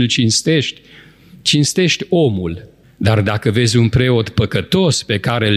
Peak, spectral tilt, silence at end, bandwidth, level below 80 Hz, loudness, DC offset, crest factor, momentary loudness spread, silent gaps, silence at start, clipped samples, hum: -2 dBFS; -4.5 dB/octave; 0 s; 13 kHz; -40 dBFS; -15 LUFS; under 0.1%; 14 dB; 7 LU; none; 0 s; under 0.1%; none